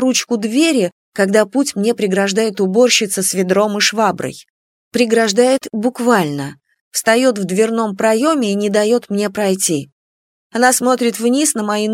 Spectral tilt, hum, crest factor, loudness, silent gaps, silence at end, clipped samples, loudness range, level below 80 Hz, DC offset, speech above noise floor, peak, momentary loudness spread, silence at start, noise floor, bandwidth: -3.5 dB/octave; none; 16 dB; -15 LUFS; 0.92-1.12 s, 4.50-4.91 s, 6.81-6.91 s, 9.92-10.50 s; 0 s; under 0.1%; 2 LU; -64 dBFS; under 0.1%; over 75 dB; 0 dBFS; 7 LU; 0 s; under -90 dBFS; 16.5 kHz